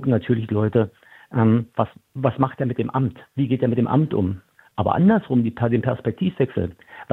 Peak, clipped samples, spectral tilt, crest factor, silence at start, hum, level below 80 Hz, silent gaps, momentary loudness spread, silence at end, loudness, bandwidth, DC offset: -2 dBFS; under 0.1%; -10.5 dB/octave; 18 dB; 0 s; none; -54 dBFS; none; 9 LU; 0 s; -22 LUFS; 4 kHz; under 0.1%